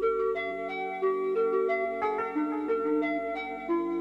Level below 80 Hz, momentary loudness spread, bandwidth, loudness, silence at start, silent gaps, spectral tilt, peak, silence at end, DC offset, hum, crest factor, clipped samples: -64 dBFS; 6 LU; 7.2 kHz; -30 LUFS; 0 s; none; -6.5 dB/octave; -16 dBFS; 0 s; under 0.1%; none; 12 dB; under 0.1%